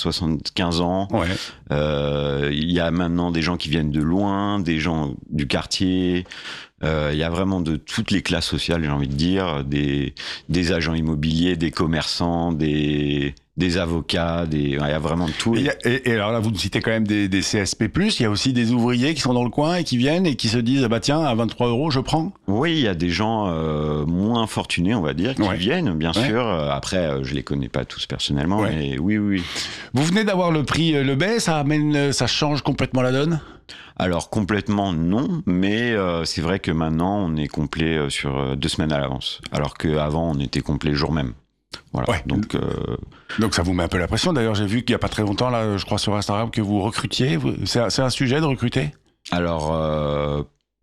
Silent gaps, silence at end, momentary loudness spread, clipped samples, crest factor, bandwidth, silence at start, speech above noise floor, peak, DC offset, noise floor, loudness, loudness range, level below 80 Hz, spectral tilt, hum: none; 0.35 s; 6 LU; under 0.1%; 14 dB; 13.5 kHz; 0 s; 21 dB; -8 dBFS; under 0.1%; -43 dBFS; -21 LUFS; 3 LU; -40 dBFS; -5.5 dB/octave; none